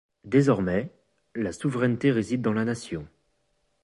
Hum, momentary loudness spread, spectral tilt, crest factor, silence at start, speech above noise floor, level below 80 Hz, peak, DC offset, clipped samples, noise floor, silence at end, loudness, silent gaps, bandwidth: none; 14 LU; -7 dB/octave; 18 dB; 0.25 s; 48 dB; -54 dBFS; -8 dBFS; under 0.1%; under 0.1%; -72 dBFS; 0.75 s; -26 LUFS; none; 11.5 kHz